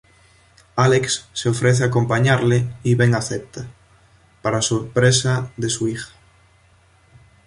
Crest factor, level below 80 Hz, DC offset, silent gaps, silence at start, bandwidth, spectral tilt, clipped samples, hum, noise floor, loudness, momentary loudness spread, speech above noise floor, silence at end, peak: 18 dB; -50 dBFS; under 0.1%; none; 0.75 s; 11.5 kHz; -5 dB/octave; under 0.1%; none; -54 dBFS; -19 LUFS; 13 LU; 36 dB; 1.4 s; -2 dBFS